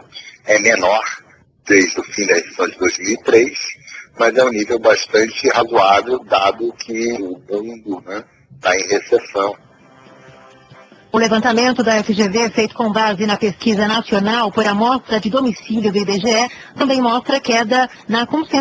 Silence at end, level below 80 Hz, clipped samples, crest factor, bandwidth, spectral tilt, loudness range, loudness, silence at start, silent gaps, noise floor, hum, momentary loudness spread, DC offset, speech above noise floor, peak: 0 s; -54 dBFS; under 0.1%; 16 dB; 8 kHz; -3.5 dB/octave; 5 LU; -16 LUFS; 0.15 s; none; -45 dBFS; none; 11 LU; under 0.1%; 29 dB; 0 dBFS